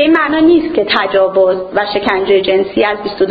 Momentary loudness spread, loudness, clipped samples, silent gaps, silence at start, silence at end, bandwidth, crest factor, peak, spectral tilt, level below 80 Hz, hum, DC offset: 5 LU; -12 LUFS; under 0.1%; none; 0 s; 0 s; 5 kHz; 12 dB; 0 dBFS; -7 dB/octave; -44 dBFS; none; under 0.1%